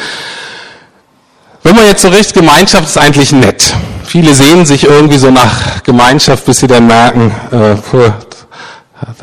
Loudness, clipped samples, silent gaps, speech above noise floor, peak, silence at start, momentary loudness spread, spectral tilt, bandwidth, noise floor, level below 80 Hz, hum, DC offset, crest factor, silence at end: -5 LUFS; 4%; none; 42 dB; 0 dBFS; 0 s; 14 LU; -4.5 dB/octave; over 20 kHz; -47 dBFS; -30 dBFS; none; 0.9%; 6 dB; 0.1 s